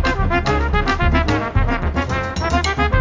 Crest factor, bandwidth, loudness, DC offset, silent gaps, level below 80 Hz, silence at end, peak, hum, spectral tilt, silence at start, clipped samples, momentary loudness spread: 14 dB; 7.6 kHz; -19 LUFS; under 0.1%; none; -22 dBFS; 0 s; -2 dBFS; none; -6 dB/octave; 0 s; under 0.1%; 4 LU